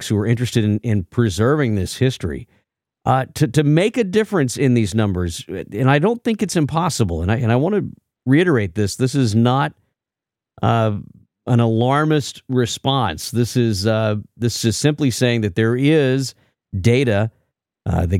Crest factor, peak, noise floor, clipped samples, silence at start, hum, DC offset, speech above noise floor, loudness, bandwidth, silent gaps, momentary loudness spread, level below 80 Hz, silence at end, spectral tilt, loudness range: 16 dB; -2 dBFS; -87 dBFS; under 0.1%; 0 s; none; under 0.1%; 70 dB; -18 LUFS; 16 kHz; none; 8 LU; -42 dBFS; 0 s; -6 dB/octave; 2 LU